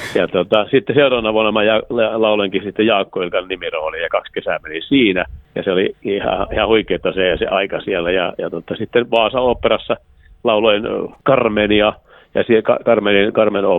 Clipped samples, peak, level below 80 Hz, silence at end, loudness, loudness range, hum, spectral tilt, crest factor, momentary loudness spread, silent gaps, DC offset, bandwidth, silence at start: under 0.1%; 0 dBFS; -42 dBFS; 0 s; -16 LUFS; 3 LU; none; -6.5 dB/octave; 16 dB; 8 LU; none; under 0.1%; 9 kHz; 0 s